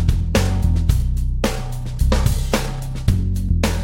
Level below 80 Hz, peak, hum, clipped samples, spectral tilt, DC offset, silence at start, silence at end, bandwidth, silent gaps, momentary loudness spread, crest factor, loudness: -20 dBFS; -2 dBFS; none; under 0.1%; -6 dB/octave; under 0.1%; 0 s; 0 s; 16.5 kHz; none; 5 LU; 16 dB; -21 LUFS